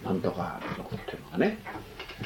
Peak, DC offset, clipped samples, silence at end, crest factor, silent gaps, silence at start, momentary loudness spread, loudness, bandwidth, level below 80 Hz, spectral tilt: -12 dBFS; under 0.1%; under 0.1%; 0 s; 20 dB; none; 0 s; 12 LU; -33 LUFS; 17 kHz; -54 dBFS; -7 dB/octave